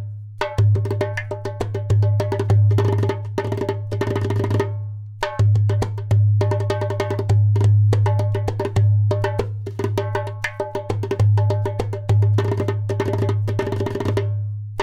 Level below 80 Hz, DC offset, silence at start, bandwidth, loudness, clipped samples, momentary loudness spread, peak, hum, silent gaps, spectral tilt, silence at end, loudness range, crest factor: -42 dBFS; under 0.1%; 0 s; 8.4 kHz; -21 LUFS; under 0.1%; 9 LU; -6 dBFS; none; none; -8 dB/octave; 0 s; 3 LU; 12 dB